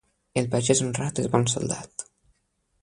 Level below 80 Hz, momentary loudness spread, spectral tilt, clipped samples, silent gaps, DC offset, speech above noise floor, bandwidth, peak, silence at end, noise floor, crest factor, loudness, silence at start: -56 dBFS; 16 LU; -4.5 dB/octave; under 0.1%; none; under 0.1%; 48 dB; 11 kHz; -4 dBFS; 0.8 s; -72 dBFS; 22 dB; -25 LUFS; 0.35 s